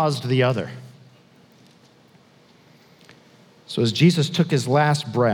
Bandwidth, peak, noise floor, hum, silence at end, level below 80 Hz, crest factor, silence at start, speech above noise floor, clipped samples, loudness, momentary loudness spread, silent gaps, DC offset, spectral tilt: 15.5 kHz; -4 dBFS; -54 dBFS; none; 0 s; -74 dBFS; 18 dB; 0 s; 34 dB; under 0.1%; -20 LUFS; 13 LU; none; under 0.1%; -6 dB/octave